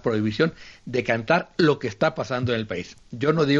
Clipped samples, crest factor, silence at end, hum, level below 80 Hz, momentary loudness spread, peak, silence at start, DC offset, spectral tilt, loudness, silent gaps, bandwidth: under 0.1%; 18 dB; 0 s; none; -56 dBFS; 10 LU; -4 dBFS; 0.05 s; under 0.1%; -6.5 dB/octave; -24 LUFS; none; 7.8 kHz